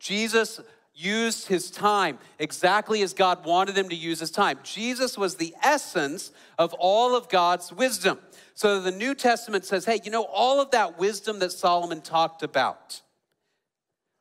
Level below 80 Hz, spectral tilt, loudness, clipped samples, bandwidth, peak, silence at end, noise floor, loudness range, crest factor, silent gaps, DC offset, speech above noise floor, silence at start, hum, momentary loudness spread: -74 dBFS; -3 dB/octave; -25 LUFS; under 0.1%; 16 kHz; -8 dBFS; 1.25 s; -84 dBFS; 2 LU; 18 dB; none; under 0.1%; 59 dB; 0 s; none; 8 LU